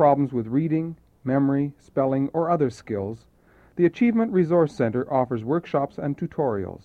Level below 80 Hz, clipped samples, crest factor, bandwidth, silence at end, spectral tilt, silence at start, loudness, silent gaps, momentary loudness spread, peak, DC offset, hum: -58 dBFS; under 0.1%; 16 dB; 8.6 kHz; 0.05 s; -9.5 dB/octave; 0 s; -24 LUFS; none; 10 LU; -6 dBFS; under 0.1%; none